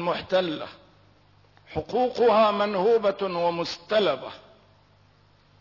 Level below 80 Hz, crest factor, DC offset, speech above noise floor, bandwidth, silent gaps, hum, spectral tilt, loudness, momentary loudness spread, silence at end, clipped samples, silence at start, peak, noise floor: -60 dBFS; 14 dB; under 0.1%; 35 dB; 6 kHz; none; 50 Hz at -65 dBFS; -5.5 dB/octave; -24 LUFS; 15 LU; 1.25 s; under 0.1%; 0 s; -12 dBFS; -59 dBFS